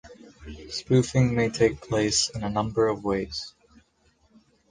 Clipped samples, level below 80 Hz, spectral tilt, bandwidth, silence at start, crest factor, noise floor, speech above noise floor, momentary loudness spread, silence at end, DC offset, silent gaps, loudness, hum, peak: under 0.1%; -48 dBFS; -5 dB/octave; 10 kHz; 0.05 s; 20 dB; -65 dBFS; 40 dB; 17 LU; 1.2 s; under 0.1%; none; -25 LUFS; none; -8 dBFS